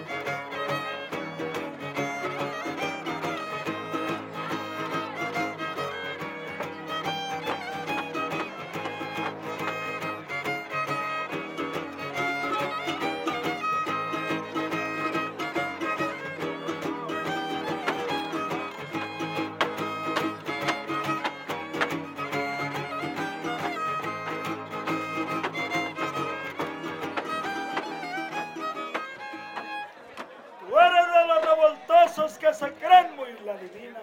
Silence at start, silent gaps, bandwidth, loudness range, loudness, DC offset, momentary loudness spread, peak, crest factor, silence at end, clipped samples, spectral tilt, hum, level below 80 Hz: 0 s; none; 17 kHz; 9 LU; -28 LUFS; under 0.1%; 12 LU; -4 dBFS; 24 dB; 0 s; under 0.1%; -4.5 dB/octave; none; -74 dBFS